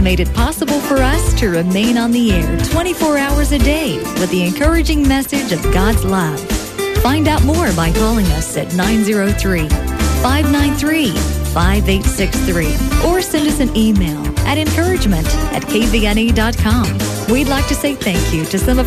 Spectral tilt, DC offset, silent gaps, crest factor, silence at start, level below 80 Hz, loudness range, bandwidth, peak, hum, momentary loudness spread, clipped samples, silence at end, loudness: -5 dB/octave; under 0.1%; none; 14 dB; 0 s; -20 dBFS; 1 LU; 14 kHz; 0 dBFS; none; 4 LU; under 0.1%; 0 s; -15 LUFS